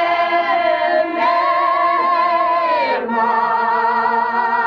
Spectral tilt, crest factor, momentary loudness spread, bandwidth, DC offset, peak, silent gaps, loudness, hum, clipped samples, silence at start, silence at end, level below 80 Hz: -5 dB/octave; 10 dB; 2 LU; 6.4 kHz; under 0.1%; -6 dBFS; none; -16 LUFS; none; under 0.1%; 0 s; 0 s; -60 dBFS